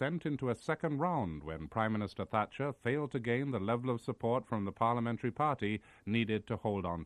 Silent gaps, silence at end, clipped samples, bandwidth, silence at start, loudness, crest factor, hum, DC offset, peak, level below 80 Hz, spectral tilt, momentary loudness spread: none; 0 s; under 0.1%; 11 kHz; 0 s; -36 LUFS; 20 dB; none; under 0.1%; -16 dBFS; -62 dBFS; -7.5 dB/octave; 4 LU